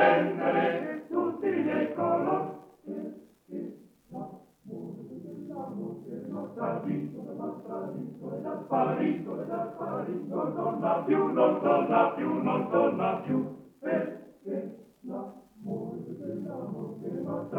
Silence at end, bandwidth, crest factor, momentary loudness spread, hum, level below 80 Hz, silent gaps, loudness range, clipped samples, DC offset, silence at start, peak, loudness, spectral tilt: 0 s; 6.2 kHz; 20 dB; 17 LU; none; -76 dBFS; none; 12 LU; under 0.1%; under 0.1%; 0 s; -10 dBFS; -31 LUFS; -8.5 dB/octave